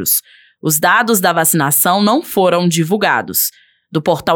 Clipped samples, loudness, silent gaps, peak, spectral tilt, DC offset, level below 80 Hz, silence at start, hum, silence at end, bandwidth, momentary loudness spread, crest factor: under 0.1%; -13 LUFS; none; 0 dBFS; -3.5 dB/octave; under 0.1%; -58 dBFS; 0 s; none; 0 s; over 20 kHz; 6 LU; 14 dB